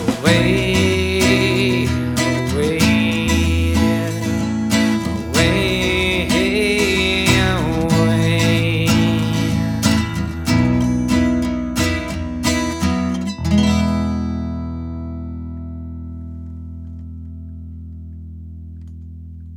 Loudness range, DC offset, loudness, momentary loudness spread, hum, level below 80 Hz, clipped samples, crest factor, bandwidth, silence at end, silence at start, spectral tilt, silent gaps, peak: 15 LU; under 0.1%; -17 LUFS; 19 LU; none; -32 dBFS; under 0.1%; 18 dB; 19.5 kHz; 0 s; 0 s; -5 dB/octave; none; 0 dBFS